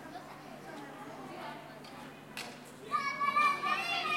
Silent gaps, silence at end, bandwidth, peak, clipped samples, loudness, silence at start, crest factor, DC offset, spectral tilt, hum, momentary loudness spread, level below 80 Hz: none; 0 s; 16.5 kHz; -18 dBFS; under 0.1%; -33 LUFS; 0 s; 18 dB; under 0.1%; -2.5 dB/octave; none; 19 LU; -76 dBFS